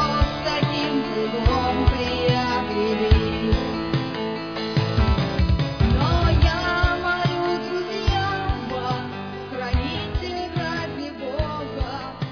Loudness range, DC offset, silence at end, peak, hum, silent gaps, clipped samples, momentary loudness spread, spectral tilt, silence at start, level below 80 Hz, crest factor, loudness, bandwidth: 6 LU; 0.3%; 0 s; -4 dBFS; none; none; under 0.1%; 8 LU; -7 dB/octave; 0 s; -28 dBFS; 18 dB; -23 LUFS; 5.4 kHz